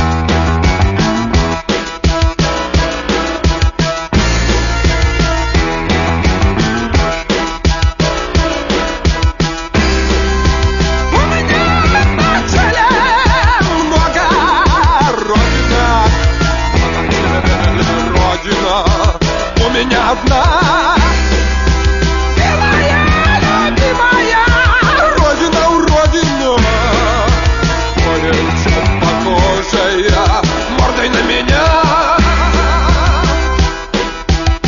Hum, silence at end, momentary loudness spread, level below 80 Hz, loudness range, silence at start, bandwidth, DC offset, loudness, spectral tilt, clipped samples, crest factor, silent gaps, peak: none; 0 s; 5 LU; -16 dBFS; 4 LU; 0 s; 7.4 kHz; 0.4%; -12 LUFS; -5 dB/octave; under 0.1%; 10 dB; none; 0 dBFS